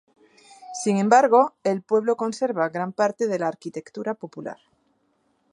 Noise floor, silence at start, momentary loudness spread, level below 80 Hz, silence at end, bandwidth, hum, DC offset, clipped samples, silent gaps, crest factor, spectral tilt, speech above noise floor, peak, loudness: -68 dBFS; 0.6 s; 18 LU; -78 dBFS; 1 s; 11.5 kHz; none; under 0.1%; under 0.1%; none; 22 dB; -5.5 dB/octave; 46 dB; -2 dBFS; -22 LUFS